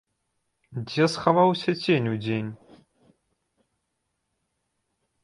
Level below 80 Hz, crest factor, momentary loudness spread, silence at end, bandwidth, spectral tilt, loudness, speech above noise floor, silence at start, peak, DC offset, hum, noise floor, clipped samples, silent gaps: -66 dBFS; 24 dB; 17 LU; 2.7 s; 11.5 kHz; -6.5 dB/octave; -24 LUFS; 55 dB; 0.7 s; -4 dBFS; under 0.1%; none; -78 dBFS; under 0.1%; none